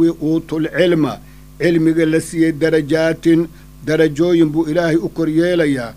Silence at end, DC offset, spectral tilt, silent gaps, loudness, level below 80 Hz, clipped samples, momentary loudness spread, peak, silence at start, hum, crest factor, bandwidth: 0 s; under 0.1%; -6.5 dB/octave; none; -16 LUFS; -42 dBFS; under 0.1%; 6 LU; 0 dBFS; 0 s; none; 14 dB; 15 kHz